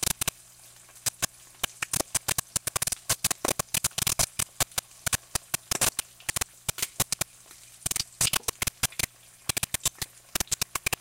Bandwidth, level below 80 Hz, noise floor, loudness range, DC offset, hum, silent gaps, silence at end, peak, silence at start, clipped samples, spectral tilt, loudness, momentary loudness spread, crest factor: 17 kHz; -50 dBFS; -52 dBFS; 2 LU; under 0.1%; none; none; 0.2 s; -8 dBFS; 0 s; under 0.1%; -1 dB/octave; -28 LUFS; 7 LU; 24 dB